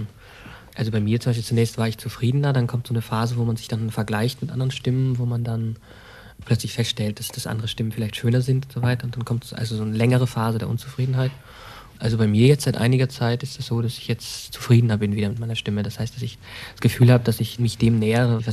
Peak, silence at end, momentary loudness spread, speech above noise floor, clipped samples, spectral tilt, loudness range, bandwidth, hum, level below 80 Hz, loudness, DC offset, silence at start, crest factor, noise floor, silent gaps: -4 dBFS; 0 s; 11 LU; 21 dB; under 0.1%; -6.5 dB/octave; 4 LU; 14 kHz; none; -50 dBFS; -23 LUFS; under 0.1%; 0 s; 18 dB; -43 dBFS; none